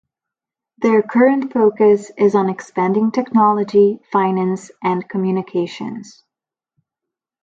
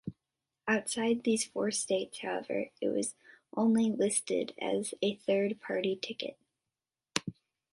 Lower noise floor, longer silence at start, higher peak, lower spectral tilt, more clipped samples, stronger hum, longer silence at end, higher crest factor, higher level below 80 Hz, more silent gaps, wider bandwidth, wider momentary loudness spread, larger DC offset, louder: about the same, -87 dBFS vs under -90 dBFS; first, 0.8 s vs 0.05 s; first, -2 dBFS vs -8 dBFS; first, -7.5 dB/octave vs -3.5 dB/octave; neither; neither; first, 1.35 s vs 0.4 s; second, 16 dB vs 26 dB; first, -66 dBFS vs -74 dBFS; neither; second, 7.6 kHz vs 11.5 kHz; about the same, 8 LU vs 10 LU; neither; first, -16 LUFS vs -33 LUFS